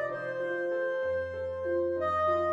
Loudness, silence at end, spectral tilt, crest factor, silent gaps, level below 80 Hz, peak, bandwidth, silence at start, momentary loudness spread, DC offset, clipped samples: -31 LUFS; 0 s; -7 dB/octave; 14 dB; none; -60 dBFS; -18 dBFS; 7.2 kHz; 0 s; 6 LU; under 0.1%; under 0.1%